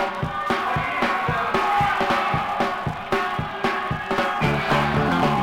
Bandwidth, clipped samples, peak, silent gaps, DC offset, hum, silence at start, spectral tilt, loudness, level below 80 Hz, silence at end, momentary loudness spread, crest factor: 16.5 kHz; under 0.1%; -6 dBFS; none; under 0.1%; none; 0 s; -5.5 dB/octave; -22 LUFS; -42 dBFS; 0 s; 5 LU; 16 dB